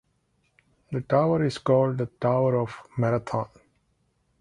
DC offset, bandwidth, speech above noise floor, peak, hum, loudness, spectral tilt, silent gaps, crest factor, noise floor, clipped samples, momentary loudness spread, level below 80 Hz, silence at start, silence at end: under 0.1%; 11 kHz; 46 dB; -6 dBFS; none; -25 LUFS; -8 dB/octave; none; 20 dB; -70 dBFS; under 0.1%; 10 LU; -60 dBFS; 0.9 s; 0.95 s